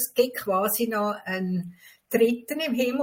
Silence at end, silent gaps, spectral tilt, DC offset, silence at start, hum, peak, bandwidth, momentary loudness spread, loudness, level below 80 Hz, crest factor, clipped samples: 0 s; none; -4.5 dB/octave; under 0.1%; 0 s; none; -8 dBFS; 17 kHz; 7 LU; -26 LUFS; -70 dBFS; 18 dB; under 0.1%